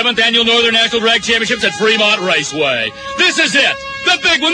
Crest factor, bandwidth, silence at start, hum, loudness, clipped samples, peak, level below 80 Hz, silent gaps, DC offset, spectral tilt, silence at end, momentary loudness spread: 12 dB; 10.5 kHz; 0 s; none; -12 LUFS; under 0.1%; 0 dBFS; -48 dBFS; none; under 0.1%; -1.5 dB/octave; 0 s; 5 LU